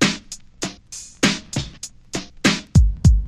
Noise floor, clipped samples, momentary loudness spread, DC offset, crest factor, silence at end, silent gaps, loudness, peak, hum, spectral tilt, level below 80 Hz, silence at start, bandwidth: -39 dBFS; under 0.1%; 19 LU; under 0.1%; 18 dB; 0 s; none; -21 LUFS; -2 dBFS; none; -4.5 dB/octave; -24 dBFS; 0 s; 13.5 kHz